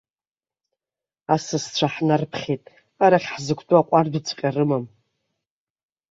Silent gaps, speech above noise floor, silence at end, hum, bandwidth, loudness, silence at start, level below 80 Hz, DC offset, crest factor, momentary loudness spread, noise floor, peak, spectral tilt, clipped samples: none; over 69 dB; 1.25 s; none; 7.8 kHz; -22 LUFS; 1.3 s; -64 dBFS; under 0.1%; 20 dB; 10 LU; under -90 dBFS; -2 dBFS; -5.5 dB/octave; under 0.1%